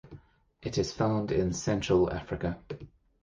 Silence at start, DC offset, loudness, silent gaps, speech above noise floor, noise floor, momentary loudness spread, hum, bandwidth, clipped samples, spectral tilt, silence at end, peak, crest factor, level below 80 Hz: 0.05 s; under 0.1%; -30 LUFS; none; 25 dB; -54 dBFS; 15 LU; none; 9.6 kHz; under 0.1%; -6 dB/octave; 0.4 s; -14 dBFS; 18 dB; -48 dBFS